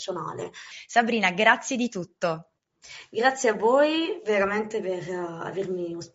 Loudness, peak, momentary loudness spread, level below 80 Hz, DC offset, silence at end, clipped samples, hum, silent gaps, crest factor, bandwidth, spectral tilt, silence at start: -25 LUFS; -2 dBFS; 15 LU; -68 dBFS; under 0.1%; 0.1 s; under 0.1%; none; none; 24 dB; 8 kHz; -2.5 dB/octave; 0 s